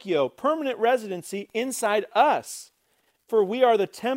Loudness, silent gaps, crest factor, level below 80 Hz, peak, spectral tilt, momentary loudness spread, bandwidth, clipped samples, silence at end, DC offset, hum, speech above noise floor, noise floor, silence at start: -24 LUFS; none; 18 dB; -80 dBFS; -6 dBFS; -3.5 dB/octave; 11 LU; 16 kHz; under 0.1%; 0 s; under 0.1%; none; 45 dB; -69 dBFS; 0.05 s